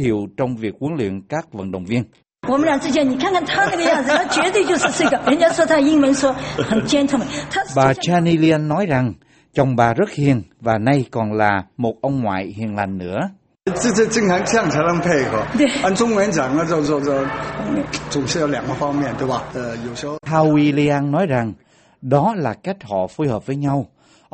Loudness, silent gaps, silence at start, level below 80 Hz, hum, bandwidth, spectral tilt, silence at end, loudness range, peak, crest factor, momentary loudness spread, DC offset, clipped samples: -18 LUFS; none; 0 s; -48 dBFS; none; 8.8 kHz; -5.5 dB/octave; 0.45 s; 5 LU; 0 dBFS; 18 dB; 10 LU; under 0.1%; under 0.1%